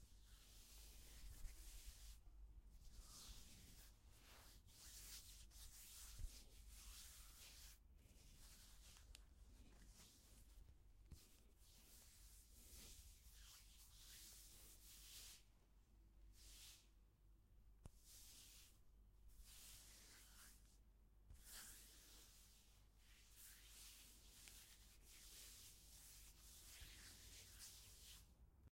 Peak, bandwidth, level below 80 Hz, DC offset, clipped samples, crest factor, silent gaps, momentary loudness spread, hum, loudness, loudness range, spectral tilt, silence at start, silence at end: -40 dBFS; 16.5 kHz; -66 dBFS; under 0.1%; under 0.1%; 24 dB; none; 8 LU; none; -63 LUFS; 5 LU; -1.5 dB/octave; 0 s; 0 s